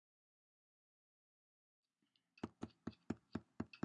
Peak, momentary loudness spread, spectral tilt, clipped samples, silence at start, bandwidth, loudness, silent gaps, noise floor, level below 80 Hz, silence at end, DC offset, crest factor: -28 dBFS; 5 LU; -7 dB/octave; under 0.1%; 2.45 s; 8.2 kHz; -52 LUFS; none; -85 dBFS; -80 dBFS; 0.05 s; under 0.1%; 28 dB